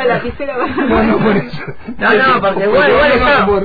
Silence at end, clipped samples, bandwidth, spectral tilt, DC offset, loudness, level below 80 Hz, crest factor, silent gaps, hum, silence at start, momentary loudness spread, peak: 0 s; under 0.1%; 5 kHz; -8 dB/octave; 3%; -12 LUFS; -32 dBFS; 12 dB; none; none; 0 s; 11 LU; 0 dBFS